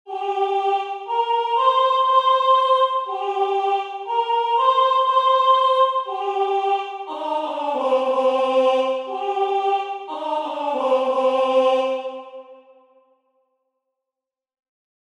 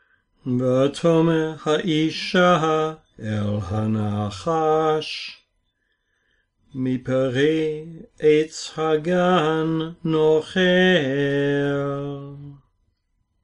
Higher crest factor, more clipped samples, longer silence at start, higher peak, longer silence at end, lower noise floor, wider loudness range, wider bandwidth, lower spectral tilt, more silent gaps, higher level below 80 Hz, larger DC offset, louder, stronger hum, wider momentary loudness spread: about the same, 14 dB vs 16 dB; neither; second, 0.05 s vs 0.45 s; about the same, -6 dBFS vs -6 dBFS; first, 2.5 s vs 0.85 s; first, -87 dBFS vs -71 dBFS; about the same, 4 LU vs 5 LU; about the same, 10 kHz vs 10.5 kHz; second, -2 dB/octave vs -6 dB/octave; neither; second, -84 dBFS vs -56 dBFS; neither; about the same, -20 LUFS vs -21 LUFS; neither; second, 9 LU vs 12 LU